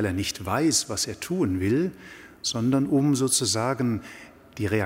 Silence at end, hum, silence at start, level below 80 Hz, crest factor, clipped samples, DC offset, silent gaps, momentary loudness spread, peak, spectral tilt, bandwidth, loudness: 0 s; none; 0 s; -54 dBFS; 16 dB; under 0.1%; under 0.1%; none; 17 LU; -10 dBFS; -4 dB/octave; 16 kHz; -25 LUFS